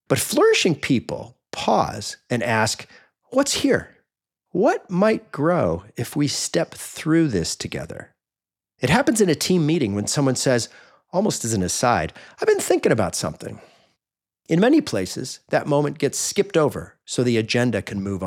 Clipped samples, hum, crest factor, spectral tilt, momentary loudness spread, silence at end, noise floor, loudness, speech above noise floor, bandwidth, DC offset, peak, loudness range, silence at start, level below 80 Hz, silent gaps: under 0.1%; none; 20 dB; -4.5 dB/octave; 11 LU; 0 s; under -90 dBFS; -21 LUFS; over 69 dB; 17.5 kHz; under 0.1%; -2 dBFS; 2 LU; 0.1 s; -56 dBFS; none